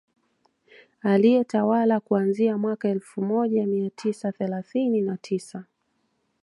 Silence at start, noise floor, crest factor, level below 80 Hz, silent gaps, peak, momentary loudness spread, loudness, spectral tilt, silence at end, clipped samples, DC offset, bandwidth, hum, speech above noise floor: 1.05 s; -72 dBFS; 16 dB; -76 dBFS; none; -8 dBFS; 10 LU; -24 LUFS; -7.5 dB/octave; 0.8 s; under 0.1%; under 0.1%; 11.5 kHz; none; 49 dB